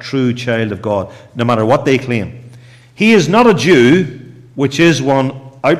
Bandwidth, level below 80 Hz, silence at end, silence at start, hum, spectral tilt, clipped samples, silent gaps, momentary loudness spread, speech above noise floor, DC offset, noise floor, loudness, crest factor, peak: 13.5 kHz; -50 dBFS; 0 s; 0 s; none; -6 dB/octave; under 0.1%; none; 11 LU; 27 dB; under 0.1%; -39 dBFS; -13 LUFS; 12 dB; -2 dBFS